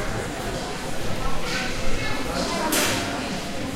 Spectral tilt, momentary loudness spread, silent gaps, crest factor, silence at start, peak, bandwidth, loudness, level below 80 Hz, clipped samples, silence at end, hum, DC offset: -3.5 dB/octave; 8 LU; none; 16 dB; 0 s; -8 dBFS; 16 kHz; -26 LUFS; -34 dBFS; under 0.1%; 0 s; none; under 0.1%